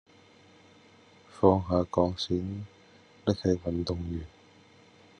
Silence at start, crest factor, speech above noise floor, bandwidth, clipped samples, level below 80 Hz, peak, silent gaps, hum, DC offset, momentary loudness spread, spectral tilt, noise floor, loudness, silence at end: 1.35 s; 24 dB; 30 dB; 9.8 kHz; under 0.1%; -58 dBFS; -8 dBFS; none; none; under 0.1%; 15 LU; -7.5 dB/octave; -58 dBFS; -29 LUFS; 0.9 s